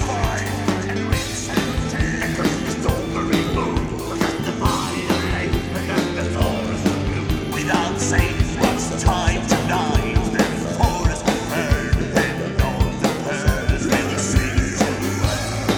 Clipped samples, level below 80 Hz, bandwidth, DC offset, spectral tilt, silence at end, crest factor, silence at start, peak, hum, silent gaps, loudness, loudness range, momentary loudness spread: under 0.1%; -28 dBFS; over 20 kHz; under 0.1%; -5 dB/octave; 0 s; 18 dB; 0 s; -2 dBFS; none; none; -21 LUFS; 2 LU; 3 LU